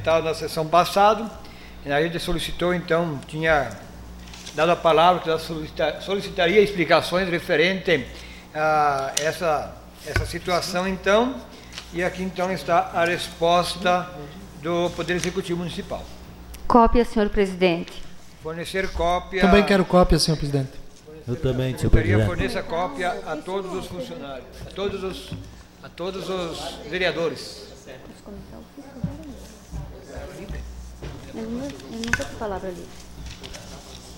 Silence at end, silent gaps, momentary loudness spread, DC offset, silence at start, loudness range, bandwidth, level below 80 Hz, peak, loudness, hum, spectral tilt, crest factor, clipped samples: 0 s; none; 22 LU; under 0.1%; 0 s; 11 LU; 16.5 kHz; -36 dBFS; 0 dBFS; -23 LUFS; none; -5 dB/octave; 22 dB; under 0.1%